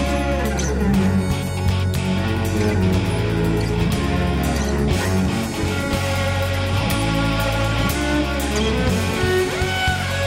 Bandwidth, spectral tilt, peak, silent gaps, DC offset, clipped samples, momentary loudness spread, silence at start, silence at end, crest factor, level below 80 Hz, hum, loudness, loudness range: 16 kHz; -5.5 dB/octave; -8 dBFS; none; under 0.1%; under 0.1%; 2 LU; 0 s; 0 s; 12 dB; -28 dBFS; none; -20 LUFS; 1 LU